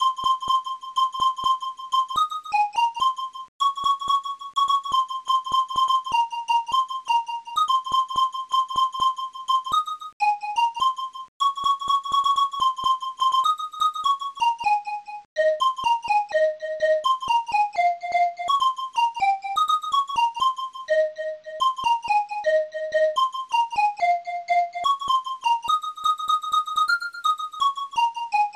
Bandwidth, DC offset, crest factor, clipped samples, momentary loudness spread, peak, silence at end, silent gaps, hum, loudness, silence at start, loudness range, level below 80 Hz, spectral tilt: 14.5 kHz; under 0.1%; 12 dB; under 0.1%; 4 LU; -12 dBFS; 0.05 s; 3.48-3.59 s, 10.13-10.20 s, 11.28-11.40 s, 15.25-15.36 s; none; -23 LUFS; 0 s; 1 LU; -64 dBFS; -0.5 dB/octave